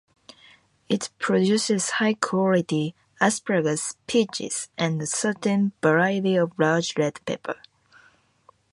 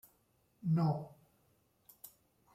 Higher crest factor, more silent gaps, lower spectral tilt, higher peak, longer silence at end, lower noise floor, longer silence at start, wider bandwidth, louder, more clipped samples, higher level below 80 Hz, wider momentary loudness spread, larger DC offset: about the same, 20 dB vs 16 dB; neither; second, -4.5 dB/octave vs -9 dB/octave; first, -4 dBFS vs -24 dBFS; first, 1.2 s vs 0.45 s; second, -59 dBFS vs -74 dBFS; first, 0.9 s vs 0.65 s; second, 11.5 kHz vs 15.5 kHz; first, -24 LUFS vs -36 LUFS; neither; first, -68 dBFS vs -76 dBFS; second, 8 LU vs 23 LU; neither